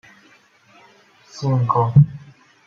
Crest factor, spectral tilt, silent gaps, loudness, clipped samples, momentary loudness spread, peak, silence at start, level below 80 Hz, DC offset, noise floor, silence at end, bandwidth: 18 dB; -9 dB/octave; none; -18 LUFS; under 0.1%; 24 LU; -2 dBFS; 1.35 s; -50 dBFS; under 0.1%; -53 dBFS; 0.5 s; 6.8 kHz